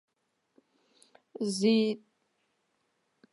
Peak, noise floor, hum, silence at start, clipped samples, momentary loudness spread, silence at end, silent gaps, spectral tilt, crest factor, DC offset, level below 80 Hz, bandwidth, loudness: -14 dBFS; -78 dBFS; none; 1.4 s; under 0.1%; 17 LU; 1.35 s; none; -5 dB/octave; 20 dB; under 0.1%; -88 dBFS; 11.5 kHz; -29 LUFS